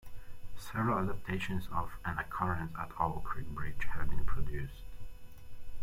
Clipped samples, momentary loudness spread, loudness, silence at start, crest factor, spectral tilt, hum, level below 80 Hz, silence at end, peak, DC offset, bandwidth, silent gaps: under 0.1%; 21 LU; -38 LUFS; 0.05 s; 16 dB; -6.5 dB/octave; none; -44 dBFS; 0 s; -16 dBFS; under 0.1%; 14.5 kHz; none